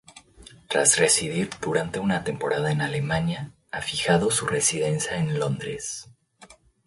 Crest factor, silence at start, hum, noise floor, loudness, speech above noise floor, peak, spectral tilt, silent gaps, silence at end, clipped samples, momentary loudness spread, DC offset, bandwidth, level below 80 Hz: 22 dB; 0.15 s; none; -53 dBFS; -24 LUFS; 28 dB; -4 dBFS; -3.5 dB/octave; none; 0.35 s; under 0.1%; 12 LU; under 0.1%; 11.5 kHz; -54 dBFS